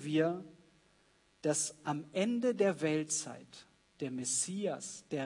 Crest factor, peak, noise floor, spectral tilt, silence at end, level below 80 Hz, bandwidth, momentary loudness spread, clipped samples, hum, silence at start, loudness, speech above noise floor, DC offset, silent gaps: 18 dB; -18 dBFS; -69 dBFS; -4 dB/octave; 0 s; -80 dBFS; 11 kHz; 13 LU; under 0.1%; none; 0 s; -35 LUFS; 35 dB; under 0.1%; none